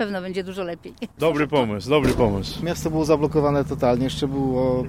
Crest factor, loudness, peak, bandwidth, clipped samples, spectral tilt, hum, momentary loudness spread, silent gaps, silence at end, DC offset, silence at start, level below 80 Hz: 18 dB; -22 LUFS; -4 dBFS; 16 kHz; under 0.1%; -6.5 dB/octave; none; 10 LU; none; 0 s; 0.2%; 0 s; -40 dBFS